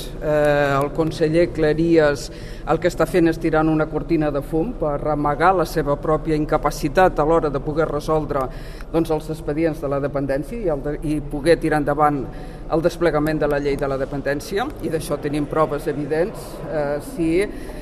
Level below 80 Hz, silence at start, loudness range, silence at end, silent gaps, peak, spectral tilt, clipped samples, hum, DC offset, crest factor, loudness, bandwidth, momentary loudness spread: -34 dBFS; 0 s; 4 LU; 0 s; none; -2 dBFS; -6.5 dB/octave; under 0.1%; none; under 0.1%; 18 dB; -21 LUFS; 14 kHz; 8 LU